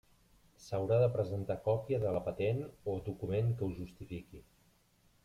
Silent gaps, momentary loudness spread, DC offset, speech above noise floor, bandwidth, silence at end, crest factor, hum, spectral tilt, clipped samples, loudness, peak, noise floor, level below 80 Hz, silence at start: none; 16 LU; under 0.1%; 35 dB; 13 kHz; 0.85 s; 18 dB; none; -8.5 dB/octave; under 0.1%; -35 LUFS; -18 dBFS; -70 dBFS; -60 dBFS; 0.6 s